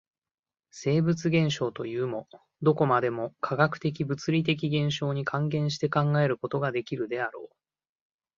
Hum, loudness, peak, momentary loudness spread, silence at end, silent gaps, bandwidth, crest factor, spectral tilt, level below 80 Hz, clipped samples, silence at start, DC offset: none; -27 LUFS; -6 dBFS; 8 LU; 0.9 s; none; 7.4 kHz; 22 dB; -6.5 dB/octave; -66 dBFS; under 0.1%; 0.75 s; under 0.1%